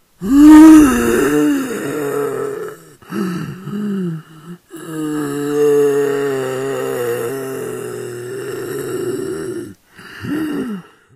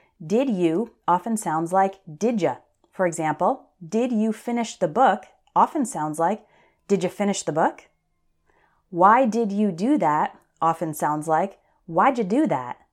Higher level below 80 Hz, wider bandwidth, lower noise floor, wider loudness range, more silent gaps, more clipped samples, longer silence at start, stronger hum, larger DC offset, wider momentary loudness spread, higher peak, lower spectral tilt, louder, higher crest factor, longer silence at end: first, -42 dBFS vs -70 dBFS; first, 15.5 kHz vs 14 kHz; second, -38 dBFS vs -69 dBFS; first, 13 LU vs 3 LU; neither; first, 0.6% vs under 0.1%; about the same, 0.2 s vs 0.2 s; neither; neither; first, 19 LU vs 7 LU; first, 0 dBFS vs -4 dBFS; about the same, -6 dB/octave vs -5.5 dB/octave; first, -14 LUFS vs -23 LUFS; second, 14 dB vs 20 dB; first, 0.35 s vs 0.2 s